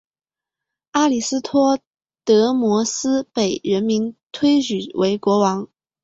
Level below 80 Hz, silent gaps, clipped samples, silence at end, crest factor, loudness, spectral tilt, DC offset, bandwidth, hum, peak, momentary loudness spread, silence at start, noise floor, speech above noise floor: -62 dBFS; 1.87-1.91 s, 4.26-4.30 s; under 0.1%; 0.4 s; 16 dB; -19 LUFS; -4.5 dB/octave; under 0.1%; 8 kHz; none; -4 dBFS; 8 LU; 0.95 s; under -90 dBFS; over 72 dB